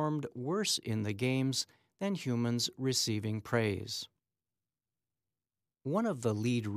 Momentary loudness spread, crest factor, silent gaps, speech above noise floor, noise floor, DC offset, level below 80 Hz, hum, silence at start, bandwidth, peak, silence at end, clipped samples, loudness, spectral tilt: 8 LU; 18 dB; none; over 57 dB; under -90 dBFS; under 0.1%; -74 dBFS; none; 0 s; 15.5 kHz; -18 dBFS; 0 s; under 0.1%; -34 LUFS; -4.5 dB/octave